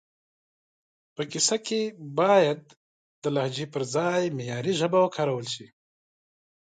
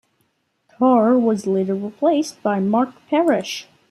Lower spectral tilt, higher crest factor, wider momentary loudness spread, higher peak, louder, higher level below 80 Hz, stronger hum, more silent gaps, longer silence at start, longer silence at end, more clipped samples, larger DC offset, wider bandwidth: second, -4 dB/octave vs -6 dB/octave; about the same, 20 dB vs 16 dB; first, 13 LU vs 7 LU; second, -8 dBFS vs -4 dBFS; second, -26 LUFS vs -19 LUFS; about the same, -74 dBFS vs -70 dBFS; neither; first, 2.77-3.22 s vs none; first, 1.2 s vs 0.8 s; first, 1.1 s vs 0.3 s; neither; neither; second, 9.6 kHz vs 14.5 kHz